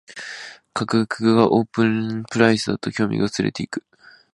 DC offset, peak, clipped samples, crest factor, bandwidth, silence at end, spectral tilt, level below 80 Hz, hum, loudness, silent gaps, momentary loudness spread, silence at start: under 0.1%; 0 dBFS; under 0.1%; 20 dB; 11.5 kHz; 0.55 s; -6 dB/octave; -56 dBFS; none; -20 LUFS; none; 16 LU; 0.1 s